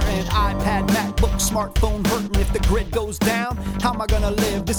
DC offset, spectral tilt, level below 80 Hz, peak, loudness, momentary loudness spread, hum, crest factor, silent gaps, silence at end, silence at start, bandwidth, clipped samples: under 0.1%; -5 dB/octave; -24 dBFS; -4 dBFS; -21 LUFS; 3 LU; none; 16 dB; none; 0 s; 0 s; over 20 kHz; under 0.1%